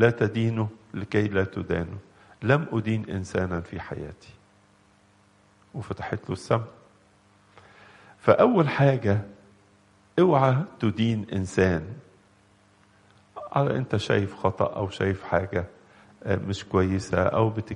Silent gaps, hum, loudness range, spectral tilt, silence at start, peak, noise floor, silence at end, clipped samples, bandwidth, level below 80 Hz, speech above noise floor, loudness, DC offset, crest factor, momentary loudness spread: none; none; 11 LU; -7.5 dB/octave; 0 s; -2 dBFS; -60 dBFS; 0 s; under 0.1%; 10.5 kHz; -54 dBFS; 35 dB; -25 LUFS; under 0.1%; 24 dB; 16 LU